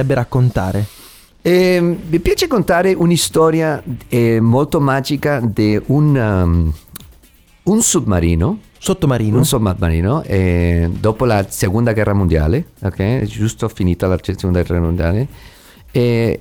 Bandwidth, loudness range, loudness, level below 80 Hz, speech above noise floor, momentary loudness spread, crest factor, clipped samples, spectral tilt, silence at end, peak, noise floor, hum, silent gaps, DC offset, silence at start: 19 kHz; 3 LU; -15 LUFS; -30 dBFS; 33 dB; 7 LU; 14 dB; under 0.1%; -6 dB/octave; 0 s; -2 dBFS; -48 dBFS; none; none; under 0.1%; 0 s